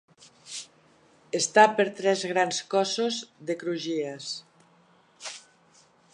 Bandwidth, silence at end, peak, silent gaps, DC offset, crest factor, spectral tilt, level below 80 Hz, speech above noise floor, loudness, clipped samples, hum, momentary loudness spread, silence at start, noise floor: 11 kHz; 0.75 s; -2 dBFS; none; under 0.1%; 26 dB; -2.5 dB/octave; -80 dBFS; 35 dB; -26 LUFS; under 0.1%; none; 20 LU; 0.45 s; -61 dBFS